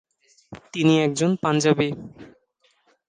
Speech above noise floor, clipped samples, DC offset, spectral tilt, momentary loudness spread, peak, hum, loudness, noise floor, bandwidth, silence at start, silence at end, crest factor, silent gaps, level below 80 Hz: 45 dB; under 0.1%; under 0.1%; -5.5 dB/octave; 16 LU; -6 dBFS; none; -21 LUFS; -66 dBFS; 10 kHz; 0.5 s; 0.85 s; 18 dB; none; -62 dBFS